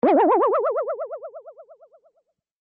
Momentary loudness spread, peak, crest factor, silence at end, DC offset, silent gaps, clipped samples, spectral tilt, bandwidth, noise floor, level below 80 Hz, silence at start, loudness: 22 LU; -8 dBFS; 14 dB; 1 s; under 0.1%; none; under 0.1%; -4.5 dB/octave; 5.2 kHz; -70 dBFS; -74 dBFS; 0.05 s; -21 LUFS